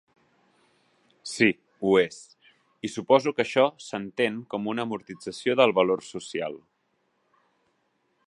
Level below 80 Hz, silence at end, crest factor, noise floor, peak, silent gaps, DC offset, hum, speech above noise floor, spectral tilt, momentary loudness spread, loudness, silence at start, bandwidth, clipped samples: -70 dBFS; 1.7 s; 22 dB; -73 dBFS; -4 dBFS; none; under 0.1%; none; 48 dB; -4.5 dB/octave; 15 LU; -25 LUFS; 1.25 s; 11.5 kHz; under 0.1%